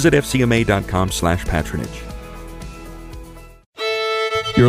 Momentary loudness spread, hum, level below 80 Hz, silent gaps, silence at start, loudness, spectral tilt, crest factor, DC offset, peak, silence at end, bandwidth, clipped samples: 20 LU; none; -32 dBFS; 3.66-3.73 s; 0 s; -19 LUFS; -5.5 dB/octave; 18 dB; under 0.1%; -2 dBFS; 0 s; 16 kHz; under 0.1%